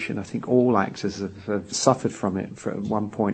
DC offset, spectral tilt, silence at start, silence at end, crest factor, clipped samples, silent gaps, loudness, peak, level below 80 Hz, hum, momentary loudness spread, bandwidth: under 0.1%; -5.5 dB/octave; 0 s; 0 s; 22 dB; under 0.1%; none; -25 LUFS; -2 dBFS; -60 dBFS; none; 10 LU; 8.8 kHz